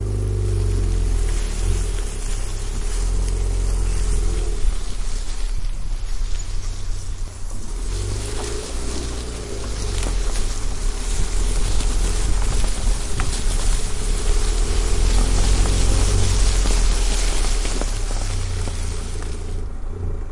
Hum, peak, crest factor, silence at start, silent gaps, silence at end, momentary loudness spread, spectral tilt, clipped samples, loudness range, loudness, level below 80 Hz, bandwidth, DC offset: none; -4 dBFS; 14 dB; 0 s; none; 0 s; 10 LU; -4 dB/octave; under 0.1%; 8 LU; -25 LUFS; -20 dBFS; 11.5 kHz; under 0.1%